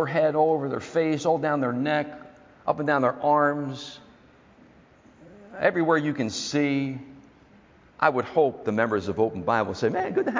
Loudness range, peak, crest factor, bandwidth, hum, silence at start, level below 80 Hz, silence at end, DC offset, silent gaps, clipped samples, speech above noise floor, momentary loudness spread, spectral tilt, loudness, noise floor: 3 LU; -6 dBFS; 20 dB; 7.6 kHz; none; 0 s; -60 dBFS; 0 s; under 0.1%; none; under 0.1%; 30 dB; 11 LU; -6 dB/octave; -25 LUFS; -55 dBFS